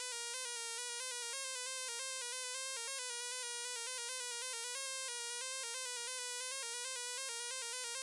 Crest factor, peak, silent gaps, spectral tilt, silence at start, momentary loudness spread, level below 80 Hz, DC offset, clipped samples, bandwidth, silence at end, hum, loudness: 16 dB; -26 dBFS; none; 7 dB/octave; 0 s; 0 LU; under -90 dBFS; under 0.1%; under 0.1%; 12 kHz; 0 s; none; -40 LUFS